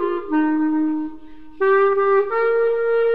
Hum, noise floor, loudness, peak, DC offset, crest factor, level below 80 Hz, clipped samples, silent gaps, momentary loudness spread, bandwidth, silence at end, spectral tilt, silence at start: none; -41 dBFS; -19 LUFS; -8 dBFS; 1%; 12 dB; -54 dBFS; under 0.1%; none; 7 LU; 4.9 kHz; 0 s; -7.5 dB/octave; 0 s